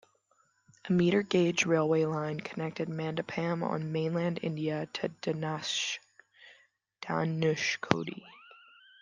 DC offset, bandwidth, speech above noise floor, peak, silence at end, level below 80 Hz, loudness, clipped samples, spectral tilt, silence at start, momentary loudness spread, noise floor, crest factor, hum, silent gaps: under 0.1%; 9.8 kHz; 41 dB; -2 dBFS; 0.45 s; -72 dBFS; -31 LUFS; under 0.1%; -5 dB/octave; 0.85 s; 10 LU; -71 dBFS; 30 dB; none; none